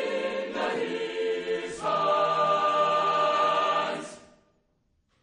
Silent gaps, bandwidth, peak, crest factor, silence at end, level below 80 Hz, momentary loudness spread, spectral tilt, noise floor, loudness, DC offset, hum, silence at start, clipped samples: none; 10.5 kHz; -12 dBFS; 14 dB; 1.05 s; -70 dBFS; 7 LU; -3.5 dB/octave; -71 dBFS; -26 LUFS; under 0.1%; none; 0 s; under 0.1%